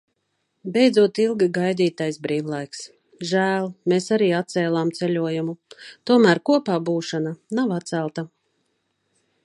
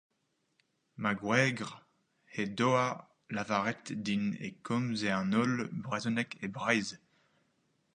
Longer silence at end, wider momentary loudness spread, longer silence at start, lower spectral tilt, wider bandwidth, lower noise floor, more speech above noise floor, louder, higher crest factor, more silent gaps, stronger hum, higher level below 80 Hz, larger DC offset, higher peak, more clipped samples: first, 1.15 s vs 1 s; first, 17 LU vs 12 LU; second, 0.65 s vs 1 s; about the same, -6 dB/octave vs -5.5 dB/octave; about the same, 11.5 kHz vs 10.5 kHz; second, -73 dBFS vs -79 dBFS; first, 52 dB vs 46 dB; first, -21 LUFS vs -33 LUFS; about the same, 20 dB vs 24 dB; neither; neither; about the same, -72 dBFS vs -72 dBFS; neither; first, -2 dBFS vs -12 dBFS; neither